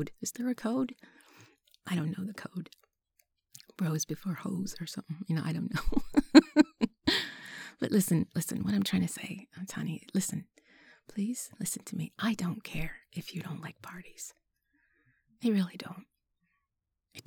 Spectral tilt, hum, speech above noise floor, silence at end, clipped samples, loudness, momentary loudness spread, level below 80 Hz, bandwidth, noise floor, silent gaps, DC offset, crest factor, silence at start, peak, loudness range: -5 dB/octave; none; 54 dB; 0.05 s; under 0.1%; -32 LUFS; 17 LU; -52 dBFS; 19.5 kHz; -85 dBFS; none; under 0.1%; 28 dB; 0 s; -4 dBFS; 11 LU